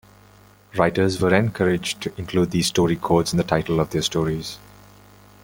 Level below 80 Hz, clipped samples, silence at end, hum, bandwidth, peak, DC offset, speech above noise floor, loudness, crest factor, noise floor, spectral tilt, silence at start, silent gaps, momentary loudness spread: -48 dBFS; under 0.1%; 0.85 s; 50 Hz at -40 dBFS; 17 kHz; -2 dBFS; under 0.1%; 30 dB; -21 LUFS; 20 dB; -51 dBFS; -5 dB/octave; 0.75 s; none; 10 LU